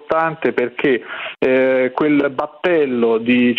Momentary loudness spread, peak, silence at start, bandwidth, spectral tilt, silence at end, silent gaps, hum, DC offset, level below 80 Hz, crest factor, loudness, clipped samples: 6 LU; -2 dBFS; 0.1 s; 5.2 kHz; -8 dB/octave; 0 s; none; none; under 0.1%; -58 dBFS; 14 dB; -17 LUFS; under 0.1%